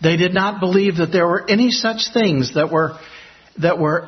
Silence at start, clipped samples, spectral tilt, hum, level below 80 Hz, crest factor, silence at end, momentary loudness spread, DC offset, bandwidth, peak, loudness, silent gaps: 0 s; under 0.1%; -5.5 dB/octave; none; -54 dBFS; 14 dB; 0 s; 4 LU; under 0.1%; 6.4 kHz; -2 dBFS; -17 LUFS; none